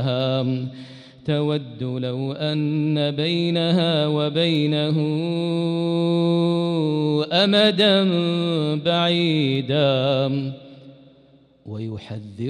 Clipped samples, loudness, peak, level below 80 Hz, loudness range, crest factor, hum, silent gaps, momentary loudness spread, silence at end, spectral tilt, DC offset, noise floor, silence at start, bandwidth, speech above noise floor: under 0.1%; -21 LUFS; -6 dBFS; -64 dBFS; 5 LU; 16 dB; none; none; 14 LU; 0 s; -7 dB/octave; under 0.1%; -54 dBFS; 0 s; 9.8 kHz; 33 dB